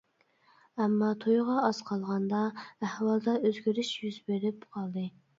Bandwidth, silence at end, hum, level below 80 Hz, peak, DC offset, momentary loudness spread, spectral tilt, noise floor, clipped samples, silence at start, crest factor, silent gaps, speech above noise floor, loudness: 7.8 kHz; 0.3 s; none; -78 dBFS; -14 dBFS; under 0.1%; 10 LU; -6.5 dB/octave; -67 dBFS; under 0.1%; 0.75 s; 18 dB; none; 37 dB; -31 LUFS